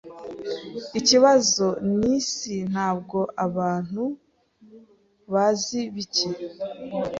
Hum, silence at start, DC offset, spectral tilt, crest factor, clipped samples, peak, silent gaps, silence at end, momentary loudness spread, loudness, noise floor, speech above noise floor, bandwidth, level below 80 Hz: none; 0.05 s; under 0.1%; -3.5 dB/octave; 20 dB; under 0.1%; -4 dBFS; none; 0 s; 16 LU; -23 LUFS; -56 dBFS; 32 dB; 7.8 kHz; -60 dBFS